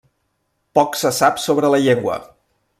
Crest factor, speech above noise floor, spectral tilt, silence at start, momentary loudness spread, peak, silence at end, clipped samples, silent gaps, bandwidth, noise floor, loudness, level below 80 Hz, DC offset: 18 dB; 53 dB; -4.5 dB/octave; 0.75 s; 7 LU; 0 dBFS; 0.55 s; under 0.1%; none; 15.5 kHz; -69 dBFS; -17 LUFS; -58 dBFS; under 0.1%